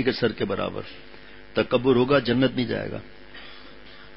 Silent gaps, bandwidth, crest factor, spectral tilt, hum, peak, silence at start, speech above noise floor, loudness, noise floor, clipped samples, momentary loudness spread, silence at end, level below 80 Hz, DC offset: none; 5.8 kHz; 20 dB; -10.5 dB/octave; none; -6 dBFS; 0 s; 23 dB; -24 LUFS; -47 dBFS; under 0.1%; 24 LU; 0.1 s; -52 dBFS; 0.6%